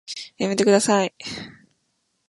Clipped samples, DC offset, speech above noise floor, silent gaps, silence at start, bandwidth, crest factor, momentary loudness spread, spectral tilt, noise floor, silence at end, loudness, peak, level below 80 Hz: under 0.1%; under 0.1%; 51 dB; none; 0.1 s; 11.5 kHz; 18 dB; 17 LU; -4 dB/octave; -72 dBFS; 0.8 s; -20 LUFS; -4 dBFS; -62 dBFS